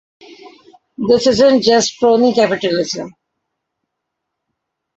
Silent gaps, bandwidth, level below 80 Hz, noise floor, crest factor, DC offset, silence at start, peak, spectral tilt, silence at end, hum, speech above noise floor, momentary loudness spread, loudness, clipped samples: none; 8 kHz; -54 dBFS; -77 dBFS; 16 dB; under 0.1%; 0.3 s; -2 dBFS; -4 dB/octave; 1.85 s; none; 64 dB; 12 LU; -13 LUFS; under 0.1%